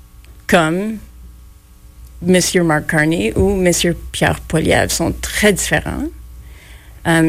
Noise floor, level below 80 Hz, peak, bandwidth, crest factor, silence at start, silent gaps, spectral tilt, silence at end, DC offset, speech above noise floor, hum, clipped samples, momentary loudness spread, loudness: -42 dBFS; -32 dBFS; -2 dBFS; 16 kHz; 16 dB; 0.2 s; none; -4.5 dB/octave; 0 s; under 0.1%; 27 dB; none; under 0.1%; 11 LU; -15 LUFS